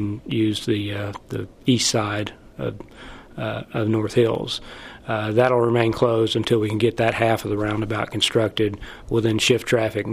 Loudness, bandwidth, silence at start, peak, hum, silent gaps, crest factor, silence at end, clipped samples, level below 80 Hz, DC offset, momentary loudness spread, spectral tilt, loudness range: -22 LUFS; 15.5 kHz; 0 s; -4 dBFS; none; none; 18 dB; 0 s; under 0.1%; -48 dBFS; under 0.1%; 13 LU; -5 dB/octave; 5 LU